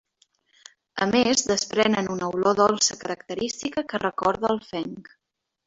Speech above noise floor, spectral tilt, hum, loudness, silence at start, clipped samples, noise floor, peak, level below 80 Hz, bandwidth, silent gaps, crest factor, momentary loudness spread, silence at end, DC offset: 42 dB; -3 dB/octave; none; -24 LUFS; 0.95 s; under 0.1%; -66 dBFS; -4 dBFS; -60 dBFS; 8 kHz; none; 20 dB; 13 LU; 0.65 s; under 0.1%